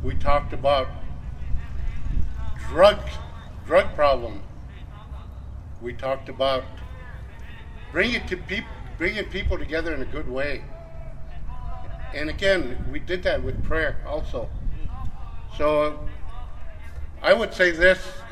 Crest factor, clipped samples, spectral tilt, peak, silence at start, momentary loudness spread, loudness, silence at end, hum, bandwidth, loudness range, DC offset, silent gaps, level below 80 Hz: 22 dB; under 0.1%; -5.5 dB/octave; -2 dBFS; 0 s; 21 LU; -24 LUFS; 0 s; none; 11.5 kHz; 7 LU; under 0.1%; none; -32 dBFS